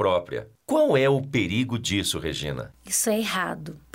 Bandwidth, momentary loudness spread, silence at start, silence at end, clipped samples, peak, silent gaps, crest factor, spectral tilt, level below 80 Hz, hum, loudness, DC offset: 16 kHz; 13 LU; 0 s; 0.15 s; under 0.1%; -10 dBFS; none; 14 dB; -4 dB/octave; -50 dBFS; none; -24 LUFS; under 0.1%